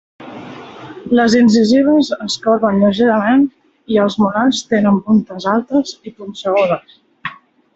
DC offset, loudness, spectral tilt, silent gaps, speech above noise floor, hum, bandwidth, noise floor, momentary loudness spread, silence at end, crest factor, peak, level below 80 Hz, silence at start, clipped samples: under 0.1%; -14 LUFS; -5.5 dB/octave; none; 20 dB; none; 8 kHz; -33 dBFS; 21 LU; 0.4 s; 12 dB; -2 dBFS; -56 dBFS; 0.2 s; under 0.1%